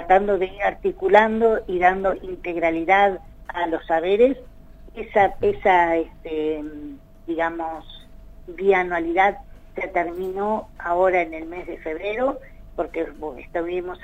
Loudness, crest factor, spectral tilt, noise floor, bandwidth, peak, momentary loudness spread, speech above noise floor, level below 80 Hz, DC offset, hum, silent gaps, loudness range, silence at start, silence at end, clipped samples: -22 LUFS; 20 dB; -6.5 dB/octave; -42 dBFS; 8 kHz; -2 dBFS; 17 LU; 21 dB; -44 dBFS; under 0.1%; none; none; 5 LU; 0 s; 0.05 s; under 0.1%